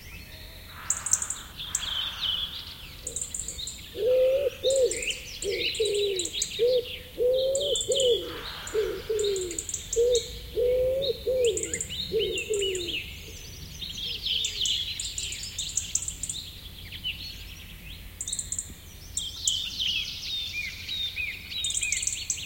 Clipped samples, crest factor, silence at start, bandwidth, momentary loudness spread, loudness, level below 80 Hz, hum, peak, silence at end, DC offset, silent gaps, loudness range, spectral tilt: under 0.1%; 24 dB; 0 s; 17 kHz; 14 LU; -28 LUFS; -48 dBFS; none; -4 dBFS; 0 s; under 0.1%; none; 6 LU; -1.5 dB/octave